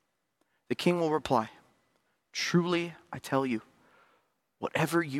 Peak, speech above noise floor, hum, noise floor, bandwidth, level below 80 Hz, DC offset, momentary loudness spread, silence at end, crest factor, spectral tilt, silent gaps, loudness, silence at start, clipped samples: -12 dBFS; 48 dB; none; -77 dBFS; 16 kHz; -68 dBFS; under 0.1%; 12 LU; 0 s; 20 dB; -5.5 dB/octave; none; -31 LUFS; 0.7 s; under 0.1%